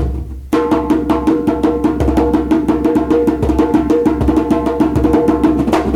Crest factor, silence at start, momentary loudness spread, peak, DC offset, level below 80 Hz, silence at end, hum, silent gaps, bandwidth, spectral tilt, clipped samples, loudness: 12 dB; 0 s; 2 LU; 0 dBFS; under 0.1%; -24 dBFS; 0 s; none; none; 13.5 kHz; -8 dB/octave; under 0.1%; -14 LUFS